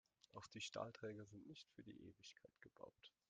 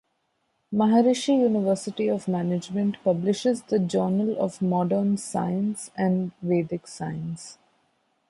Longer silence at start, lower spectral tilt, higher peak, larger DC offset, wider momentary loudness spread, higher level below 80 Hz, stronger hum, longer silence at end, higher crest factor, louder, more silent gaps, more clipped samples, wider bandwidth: second, 0.35 s vs 0.7 s; second, -4 dB/octave vs -6.5 dB/octave; second, -34 dBFS vs -8 dBFS; neither; about the same, 13 LU vs 11 LU; second, -86 dBFS vs -66 dBFS; neither; second, 0.2 s vs 0.75 s; first, 24 dB vs 16 dB; second, -57 LUFS vs -25 LUFS; neither; neither; second, 9.4 kHz vs 11.5 kHz